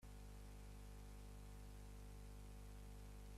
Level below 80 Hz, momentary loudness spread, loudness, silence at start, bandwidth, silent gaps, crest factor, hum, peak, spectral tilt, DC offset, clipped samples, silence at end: -58 dBFS; 0 LU; -60 LUFS; 0 s; 15 kHz; none; 10 dB; 50 Hz at -55 dBFS; -48 dBFS; -5.5 dB/octave; under 0.1%; under 0.1%; 0 s